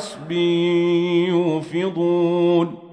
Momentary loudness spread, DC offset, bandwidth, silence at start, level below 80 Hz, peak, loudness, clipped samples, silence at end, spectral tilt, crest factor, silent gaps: 5 LU; under 0.1%; 9.8 kHz; 0 s; -68 dBFS; -6 dBFS; -19 LUFS; under 0.1%; 0 s; -7 dB/octave; 14 dB; none